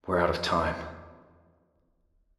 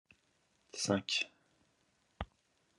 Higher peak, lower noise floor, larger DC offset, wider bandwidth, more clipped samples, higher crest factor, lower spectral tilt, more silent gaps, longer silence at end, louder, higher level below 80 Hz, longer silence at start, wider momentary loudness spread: first, -10 dBFS vs -16 dBFS; second, -70 dBFS vs -76 dBFS; neither; first, 13 kHz vs 11.5 kHz; neither; about the same, 22 dB vs 26 dB; first, -5.5 dB/octave vs -3 dB/octave; neither; first, 1.25 s vs 0.55 s; first, -28 LUFS vs -36 LUFS; first, -52 dBFS vs -62 dBFS; second, 0.05 s vs 0.75 s; about the same, 17 LU vs 16 LU